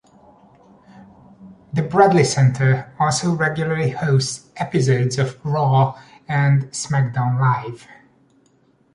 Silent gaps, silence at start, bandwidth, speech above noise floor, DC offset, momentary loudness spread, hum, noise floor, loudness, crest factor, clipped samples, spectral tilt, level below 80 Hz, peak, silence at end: none; 1.4 s; 11.5 kHz; 40 dB; under 0.1%; 10 LU; none; -58 dBFS; -19 LUFS; 18 dB; under 0.1%; -6 dB/octave; -56 dBFS; -2 dBFS; 1 s